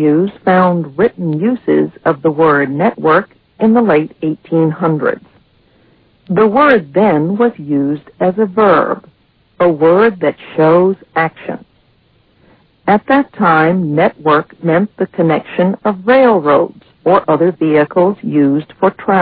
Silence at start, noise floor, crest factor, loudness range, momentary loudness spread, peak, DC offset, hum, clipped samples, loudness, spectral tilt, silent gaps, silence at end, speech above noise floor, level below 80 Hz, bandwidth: 0 s; -53 dBFS; 12 dB; 3 LU; 8 LU; 0 dBFS; under 0.1%; none; under 0.1%; -12 LUFS; -11 dB/octave; none; 0 s; 41 dB; -54 dBFS; 4.9 kHz